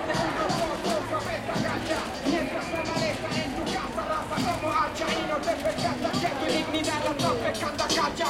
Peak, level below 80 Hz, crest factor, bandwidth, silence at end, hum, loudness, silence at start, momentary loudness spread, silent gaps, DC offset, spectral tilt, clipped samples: -12 dBFS; -48 dBFS; 16 dB; 16.5 kHz; 0 s; none; -28 LUFS; 0 s; 4 LU; none; under 0.1%; -4 dB/octave; under 0.1%